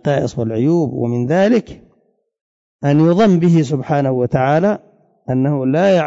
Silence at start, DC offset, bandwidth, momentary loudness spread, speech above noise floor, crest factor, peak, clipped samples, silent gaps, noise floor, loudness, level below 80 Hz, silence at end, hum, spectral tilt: 0.05 s; under 0.1%; 7.8 kHz; 8 LU; 47 dB; 12 dB; -4 dBFS; under 0.1%; 2.41-2.79 s; -61 dBFS; -15 LUFS; -50 dBFS; 0 s; none; -8 dB/octave